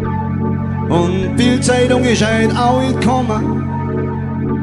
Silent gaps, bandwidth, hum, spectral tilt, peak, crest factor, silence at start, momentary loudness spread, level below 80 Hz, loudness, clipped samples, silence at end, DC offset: none; 11.5 kHz; none; -6 dB/octave; -2 dBFS; 14 dB; 0 s; 7 LU; -38 dBFS; -15 LUFS; under 0.1%; 0 s; under 0.1%